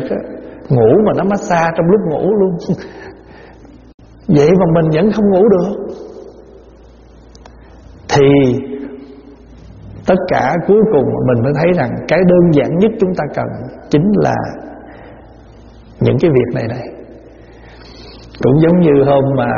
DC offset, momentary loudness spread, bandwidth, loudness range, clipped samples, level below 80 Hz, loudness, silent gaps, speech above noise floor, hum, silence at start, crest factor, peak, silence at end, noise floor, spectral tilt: under 0.1%; 21 LU; 7.2 kHz; 5 LU; under 0.1%; -40 dBFS; -13 LUFS; 3.94-3.98 s; 28 dB; none; 0 s; 14 dB; 0 dBFS; 0 s; -40 dBFS; -7.5 dB/octave